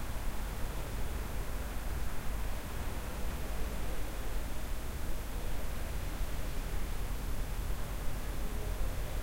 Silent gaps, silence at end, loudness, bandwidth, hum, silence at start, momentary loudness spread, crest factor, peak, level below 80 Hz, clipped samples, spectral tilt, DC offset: none; 0 s; -41 LUFS; 16 kHz; none; 0 s; 1 LU; 12 dB; -22 dBFS; -38 dBFS; under 0.1%; -5 dB/octave; under 0.1%